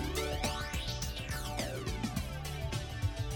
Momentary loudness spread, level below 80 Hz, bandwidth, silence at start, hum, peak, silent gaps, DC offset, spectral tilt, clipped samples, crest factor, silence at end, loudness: 4 LU; -42 dBFS; 19 kHz; 0 s; none; -20 dBFS; none; under 0.1%; -4.5 dB/octave; under 0.1%; 16 dB; 0 s; -37 LUFS